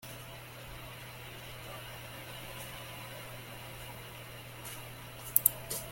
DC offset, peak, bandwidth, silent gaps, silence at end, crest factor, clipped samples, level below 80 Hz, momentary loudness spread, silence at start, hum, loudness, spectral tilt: under 0.1%; -2 dBFS; 17 kHz; none; 0 s; 40 dB; under 0.1%; -58 dBFS; 18 LU; 0 s; none; -38 LUFS; -2 dB/octave